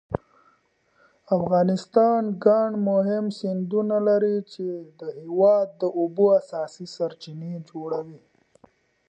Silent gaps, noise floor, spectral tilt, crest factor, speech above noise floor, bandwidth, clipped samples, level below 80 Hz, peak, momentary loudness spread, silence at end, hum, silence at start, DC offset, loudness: none; -65 dBFS; -8 dB/octave; 18 dB; 42 dB; 8.8 kHz; under 0.1%; -60 dBFS; -6 dBFS; 15 LU; 0.9 s; none; 0.1 s; under 0.1%; -23 LUFS